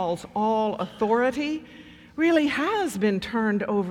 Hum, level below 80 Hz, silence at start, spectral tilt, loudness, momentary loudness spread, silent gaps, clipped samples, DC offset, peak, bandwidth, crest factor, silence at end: none; -58 dBFS; 0 s; -5.5 dB/octave; -25 LUFS; 7 LU; none; under 0.1%; under 0.1%; -8 dBFS; 16.5 kHz; 16 dB; 0 s